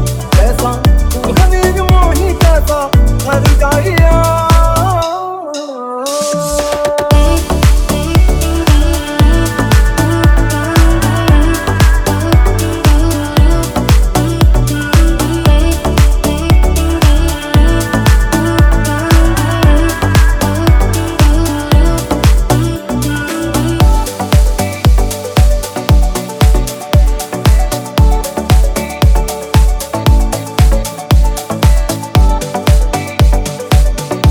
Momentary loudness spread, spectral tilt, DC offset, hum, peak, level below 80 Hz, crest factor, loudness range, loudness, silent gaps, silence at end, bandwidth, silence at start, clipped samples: 5 LU; -5.5 dB/octave; under 0.1%; none; 0 dBFS; -12 dBFS; 10 dB; 2 LU; -12 LUFS; none; 0 s; 20 kHz; 0 s; 0.2%